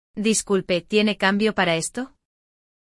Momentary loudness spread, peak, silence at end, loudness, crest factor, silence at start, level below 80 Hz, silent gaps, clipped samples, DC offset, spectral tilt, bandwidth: 9 LU; -6 dBFS; 0.85 s; -21 LUFS; 18 dB; 0.15 s; -56 dBFS; none; under 0.1%; under 0.1%; -3.5 dB/octave; 12 kHz